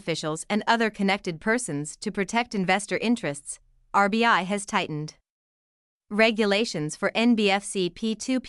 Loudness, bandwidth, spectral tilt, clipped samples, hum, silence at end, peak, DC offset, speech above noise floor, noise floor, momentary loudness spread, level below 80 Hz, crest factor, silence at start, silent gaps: -25 LUFS; 12 kHz; -4 dB/octave; under 0.1%; none; 0 s; -6 dBFS; under 0.1%; over 65 dB; under -90 dBFS; 11 LU; -60 dBFS; 20 dB; 0.05 s; 5.30-6.00 s